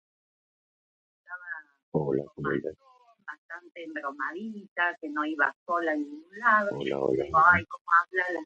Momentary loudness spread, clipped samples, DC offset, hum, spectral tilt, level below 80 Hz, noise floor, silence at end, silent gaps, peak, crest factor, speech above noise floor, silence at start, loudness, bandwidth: 20 LU; under 0.1%; under 0.1%; none; -7 dB/octave; -60 dBFS; -47 dBFS; 0 s; 1.83-1.92 s, 3.38-3.49 s, 4.68-4.76 s, 5.56-5.66 s, 7.81-7.85 s; -6 dBFS; 24 dB; 19 dB; 1.3 s; -27 LUFS; 8.2 kHz